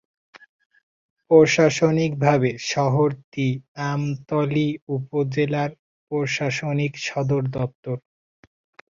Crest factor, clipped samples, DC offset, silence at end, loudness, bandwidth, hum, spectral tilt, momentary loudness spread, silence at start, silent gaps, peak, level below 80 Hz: 20 dB; under 0.1%; under 0.1%; 1 s; -22 LUFS; 7.6 kHz; none; -6 dB/octave; 11 LU; 1.3 s; 3.24-3.32 s, 3.68-3.75 s, 4.82-4.87 s, 5.79-6.07 s, 7.75-7.83 s; -2 dBFS; -58 dBFS